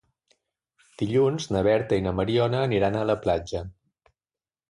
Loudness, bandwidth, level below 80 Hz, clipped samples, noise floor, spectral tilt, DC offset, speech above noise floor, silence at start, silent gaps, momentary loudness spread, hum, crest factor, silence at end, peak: -25 LUFS; 11.5 kHz; -48 dBFS; under 0.1%; under -90 dBFS; -6.5 dB/octave; under 0.1%; over 66 dB; 1 s; none; 10 LU; none; 16 dB; 1 s; -10 dBFS